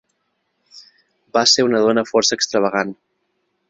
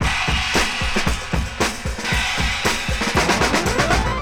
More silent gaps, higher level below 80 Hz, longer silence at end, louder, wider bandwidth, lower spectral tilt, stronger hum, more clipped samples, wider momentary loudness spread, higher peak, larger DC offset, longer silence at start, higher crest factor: neither; second, -64 dBFS vs -28 dBFS; first, 0.75 s vs 0 s; first, -16 LUFS vs -19 LUFS; second, 8 kHz vs 19 kHz; about the same, -2.5 dB/octave vs -3.5 dB/octave; neither; neither; first, 9 LU vs 5 LU; about the same, -2 dBFS vs -4 dBFS; neither; first, 0.75 s vs 0 s; about the same, 18 dB vs 16 dB